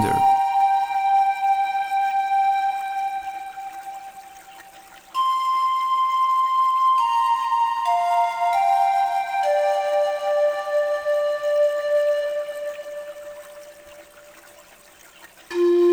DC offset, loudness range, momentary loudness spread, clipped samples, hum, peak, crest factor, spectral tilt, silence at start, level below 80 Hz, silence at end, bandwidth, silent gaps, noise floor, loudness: under 0.1%; 7 LU; 16 LU; under 0.1%; none; -10 dBFS; 12 dB; -4.5 dB/octave; 0 s; -64 dBFS; 0 s; over 20 kHz; none; -49 dBFS; -21 LUFS